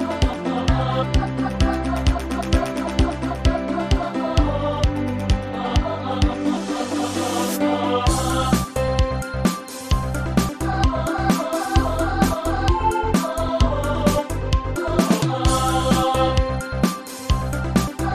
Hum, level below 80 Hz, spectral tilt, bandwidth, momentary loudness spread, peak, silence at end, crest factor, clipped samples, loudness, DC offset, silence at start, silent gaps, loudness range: none; -26 dBFS; -5.5 dB/octave; 15.5 kHz; 4 LU; -4 dBFS; 0 s; 16 dB; under 0.1%; -21 LUFS; under 0.1%; 0 s; none; 2 LU